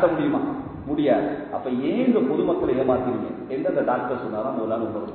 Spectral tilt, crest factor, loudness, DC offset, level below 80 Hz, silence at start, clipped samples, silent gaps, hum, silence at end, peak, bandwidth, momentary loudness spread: -11.5 dB/octave; 16 dB; -24 LUFS; under 0.1%; -52 dBFS; 0 s; under 0.1%; none; none; 0 s; -6 dBFS; 4.4 kHz; 8 LU